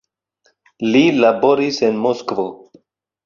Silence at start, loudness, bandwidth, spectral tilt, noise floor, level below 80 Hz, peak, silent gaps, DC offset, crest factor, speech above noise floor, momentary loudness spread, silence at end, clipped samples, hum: 0.8 s; -16 LUFS; 7.4 kHz; -5.5 dB/octave; -63 dBFS; -62 dBFS; -2 dBFS; none; under 0.1%; 16 dB; 48 dB; 11 LU; 0.7 s; under 0.1%; none